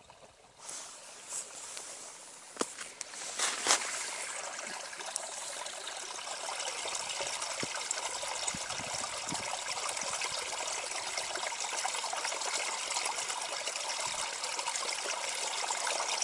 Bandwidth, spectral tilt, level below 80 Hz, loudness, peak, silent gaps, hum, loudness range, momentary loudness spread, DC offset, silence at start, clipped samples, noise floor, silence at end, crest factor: 12 kHz; 0.5 dB/octave; -74 dBFS; -35 LUFS; -4 dBFS; none; none; 4 LU; 9 LU; under 0.1%; 0 s; under 0.1%; -57 dBFS; 0 s; 32 dB